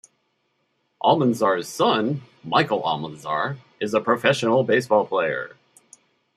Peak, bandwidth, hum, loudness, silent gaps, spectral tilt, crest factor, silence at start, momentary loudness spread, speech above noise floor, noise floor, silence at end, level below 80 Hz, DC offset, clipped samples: -2 dBFS; 14.5 kHz; none; -22 LUFS; none; -5 dB/octave; 20 dB; 1.05 s; 10 LU; 49 dB; -71 dBFS; 0.9 s; -68 dBFS; under 0.1%; under 0.1%